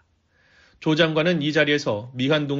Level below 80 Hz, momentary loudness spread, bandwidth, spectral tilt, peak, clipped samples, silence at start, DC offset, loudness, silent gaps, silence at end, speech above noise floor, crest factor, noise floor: -60 dBFS; 7 LU; 7.6 kHz; -4 dB/octave; -4 dBFS; under 0.1%; 0.8 s; under 0.1%; -21 LUFS; none; 0 s; 41 dB; 18 dB; -62 dBFS